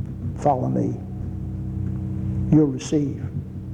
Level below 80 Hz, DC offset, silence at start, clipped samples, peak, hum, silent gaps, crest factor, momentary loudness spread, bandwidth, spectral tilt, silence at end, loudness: -40 dBFS; under 0.1%; 0 s; under 0.1%; -6 dBFS; none; none; 18 dB; 12 LU; 9.4 kHz; -8.5 dB/octave; 0 s; -24 LUFS